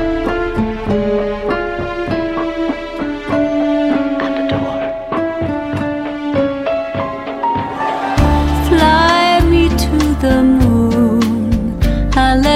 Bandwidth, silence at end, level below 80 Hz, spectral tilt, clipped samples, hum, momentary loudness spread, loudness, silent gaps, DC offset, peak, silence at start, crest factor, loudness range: 16 kHz; 0 s; -22 dBFS; -6.5 dB/octave; under 0.1%; none; 9 LU; -15 LUFS; none; under 0.1%; 0 dBFS; 0 s; 14 dB; 6 LU